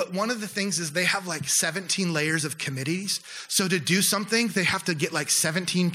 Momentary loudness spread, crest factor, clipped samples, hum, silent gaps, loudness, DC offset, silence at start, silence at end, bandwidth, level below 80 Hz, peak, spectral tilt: 6 LU; 16 dB; under 0.1%; none; none; -24 LUFS; under 0.1%; 0 s; 0 s; 16.5 kHz; -70 dBFS; -10 dBFS; -3 dB/octave